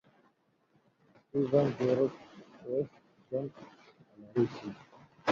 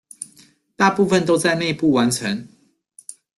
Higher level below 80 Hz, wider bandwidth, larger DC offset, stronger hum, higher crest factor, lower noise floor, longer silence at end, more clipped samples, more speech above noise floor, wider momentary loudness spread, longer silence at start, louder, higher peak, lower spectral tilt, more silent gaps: second, -72 dBFS vs -58 dBFS; second, 7.4 kHz vs 12.5 kHz; neither; neither; about the same, 22 dB vs 18 dB; first, -71 dBFS vs -53 dBFS; second, 0 s vs 0.25 s; neither; first, 40 dB vs 35 dB; about the same, 23 LU vs 21 LU; first, 1.35 s vs 0.2 s; second, -33 LUFS vs -18 LUFS; second, -14 dBFS vs -2 dBFS; first, -8 dB/octave vs -4.5 dB/octave; neither